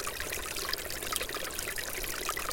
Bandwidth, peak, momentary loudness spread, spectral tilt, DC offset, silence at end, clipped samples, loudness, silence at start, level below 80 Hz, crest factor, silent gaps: 17 kHz; -8 dBFS; 2 LU; -1 dB/octave; under 0.1%; 0 s; under 0.1%; -34 LUFS; 0 s; -50 dBFS; 26 dB; none